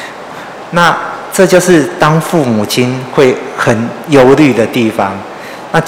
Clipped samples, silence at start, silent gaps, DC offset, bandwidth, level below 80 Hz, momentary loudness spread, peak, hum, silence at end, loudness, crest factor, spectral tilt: 4%; 0 s; none; under 0.1%; 18.5 kHz; -44 dBFS; 18 LU; 0 dBFS; none; 0 s; -10 LUFS; 10 dB; -5.5 dB/octave